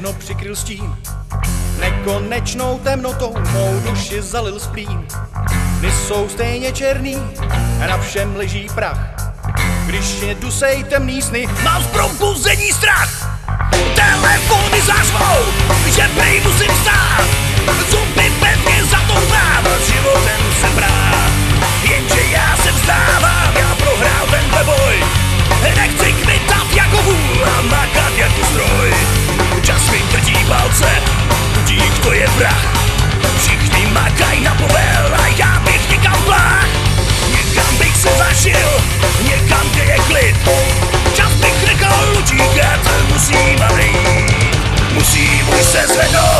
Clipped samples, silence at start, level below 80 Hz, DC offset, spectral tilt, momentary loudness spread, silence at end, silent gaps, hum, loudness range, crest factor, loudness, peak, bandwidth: under 0.1%; 0 s; -20 dBFS; under 0.1%; -3.5 dB/octave; 9 LU; 0 s; none; none; 8 LU; 12 dB; -12 LUFS; 0 dBFS; 13.5 kHz